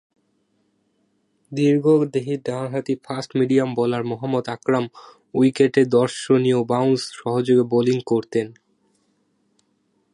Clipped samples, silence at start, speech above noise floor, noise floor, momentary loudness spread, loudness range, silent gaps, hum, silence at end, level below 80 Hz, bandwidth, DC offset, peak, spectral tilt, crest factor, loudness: under 0.1%; 1.5 s; 47 dB; -67 dBFS; 9 LU; 4 LU; none; none; 1.65 s; -66 dBFS; 11.5 kHz; under 0.1%; -4 dBFS; -6.5 dB/octave; 18 dB; -20 LUFS